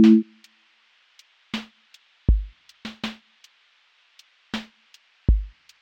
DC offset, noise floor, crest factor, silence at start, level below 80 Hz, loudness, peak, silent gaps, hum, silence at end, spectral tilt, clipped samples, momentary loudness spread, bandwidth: under 0.1%; -61 dBFS; 20 dB; 0 s; -30 dBFS; -26 LUFS; -6 dBFS; none; none; 0.35 s; -7.5 dB/octave; under 0.1%; 20 LU; 8 kHz